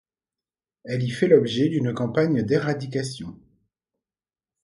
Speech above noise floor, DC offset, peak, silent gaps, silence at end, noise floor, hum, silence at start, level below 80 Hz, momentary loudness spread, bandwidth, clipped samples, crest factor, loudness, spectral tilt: over 68 dB; under 0.1%; -4 dBFS; none; 1.3 s; under -90 dBFS; none; 0.85 s; -60 dBFS; 13 LU; 11.5 kHz; under 0.1%; 22 dB; -23 LUFS; -7 dB/octave